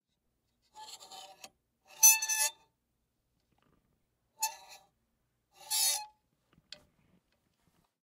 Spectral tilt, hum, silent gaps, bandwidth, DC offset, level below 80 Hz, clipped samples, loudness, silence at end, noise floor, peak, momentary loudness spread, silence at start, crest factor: 4 dB/octave; none; none; 16 kHz; under 0.1%; -82 dBFS; under 0.1%; -27 LUFS; 1.95 s; -81 dBFS; -10 dBFS; 27 LU; 0.75 s; 28 dB